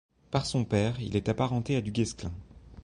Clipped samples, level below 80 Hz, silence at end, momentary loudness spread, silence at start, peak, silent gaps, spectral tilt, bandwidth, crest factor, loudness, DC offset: under 0.1%; -48 dBFS; 0.05 s; 9 LU; 0.3 s; -12 dBFS; none; -6 dB/octave; 11 kHz; 18 dB; -30 LUFS; under 0.1%